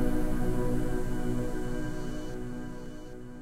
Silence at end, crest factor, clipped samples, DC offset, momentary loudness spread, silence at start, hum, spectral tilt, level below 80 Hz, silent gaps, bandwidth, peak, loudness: 0 s; 14 dB; under 0.1%; under 0.1%; 12 LU; 0 s; none; -7 dB/octave; -34 dBFS; none; 13.5 kHz; -16 dBFS; -35 LUFS